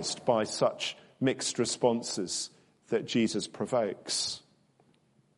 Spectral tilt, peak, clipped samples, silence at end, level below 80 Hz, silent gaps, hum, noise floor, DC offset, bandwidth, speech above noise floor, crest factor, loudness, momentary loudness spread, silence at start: -3.5 dB/octave; -10 dBFS; under 0.1%; 1 s; -72 dBFS; none; none; -67 dBFS; under 0.1%; 11.5 kHz; 37 dB; 22 dB; -31 LUFS; 7 LU; 0 s